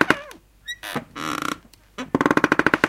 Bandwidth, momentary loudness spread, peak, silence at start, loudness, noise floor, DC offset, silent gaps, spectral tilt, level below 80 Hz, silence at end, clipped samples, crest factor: 16.5 kHz; 20 LU; 0 dBFS; 0 s; -23 LUFS; -43 dBFS; under 0.1%; none; -4.5 dB/octave; -52 dBFS; 0 s; under 0.1%; 24 dB